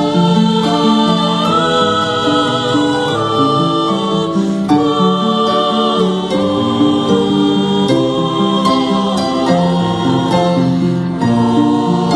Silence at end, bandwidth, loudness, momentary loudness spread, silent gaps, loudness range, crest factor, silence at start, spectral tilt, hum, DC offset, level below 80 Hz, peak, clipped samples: 0 s; 11.5 kHz; -13 LUFS; 3 LU; none; 1 LU; 12 dB; 0 s; -6 dB/octave; none; under 0.1%; -46 dBFS; 0 dBFS; under 0.1%